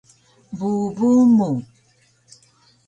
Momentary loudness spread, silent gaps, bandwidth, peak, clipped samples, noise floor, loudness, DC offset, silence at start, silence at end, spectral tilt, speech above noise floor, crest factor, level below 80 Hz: 14 LU; none; 8.8 kHz; -8 dBFS; under 0.1%; -59 dBFS; -18 LUFS; under 0.1%; 0.5 s; 1.25 s; -8.5 dB/octave; 42 dB; 14 dB; -62 dBFS